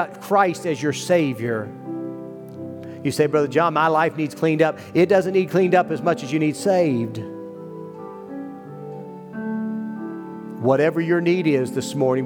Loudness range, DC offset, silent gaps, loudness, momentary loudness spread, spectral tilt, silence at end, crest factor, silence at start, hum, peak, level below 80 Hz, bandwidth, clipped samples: 9 LU; under 0.1%; none; -21 LUFS; 17 LU; -6 dB/octave; 0 s; 18 dB; 0 s; none; -4 dBFS; -70 dBFS; 18.5 kHz; under 0.1%